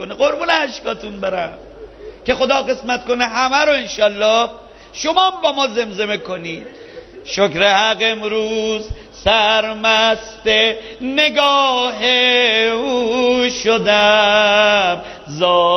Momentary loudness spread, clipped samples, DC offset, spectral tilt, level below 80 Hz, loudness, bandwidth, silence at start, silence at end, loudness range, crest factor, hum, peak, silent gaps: 13 LU; under 0.1%; under 0.1%; -2.5 dB/octave; -44 dBFS; -15 LUFS; 6.6 kHz; 0 s; 0 s; 5 LU; 16 dB; none; 0 dBFS; none